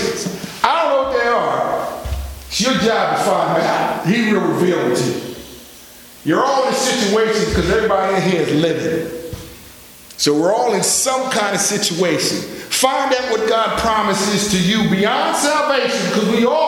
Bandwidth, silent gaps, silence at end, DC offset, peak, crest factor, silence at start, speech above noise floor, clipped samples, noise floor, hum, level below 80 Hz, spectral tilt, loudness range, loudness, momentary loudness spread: 19.5 kHz; none; 0 s; under 0.1%; 0 dBFS; 16 dB; 0 s; 24 dB; under 0.1%; -40 dBFS; none; -38 dBFS; -3.5 dB/octave; 2 LU; -16 LUFS; 10 LU